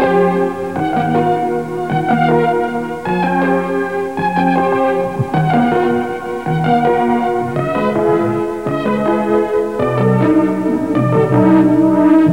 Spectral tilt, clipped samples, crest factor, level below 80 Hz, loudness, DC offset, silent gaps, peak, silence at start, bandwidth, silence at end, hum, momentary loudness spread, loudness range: -8 dB/octave; under 0.1%; 14 dB; -46 dBFS; -15 LUFS; 0.7%; none; 0 dBFS; 0 s; 12 kHz; 0 s; none; 8 LU; 2 LU